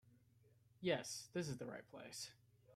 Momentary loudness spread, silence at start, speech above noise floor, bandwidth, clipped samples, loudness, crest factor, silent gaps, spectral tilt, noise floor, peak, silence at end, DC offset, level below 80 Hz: 12 LU; 0.05 s; 26 dB; 15.5 kHz; under 0.1%; -47 LUFS; 22 dB; none; -4 dB/octave; -72 dBFS; -28 dBFS; 0 s; under 0.1%; -80 dBFS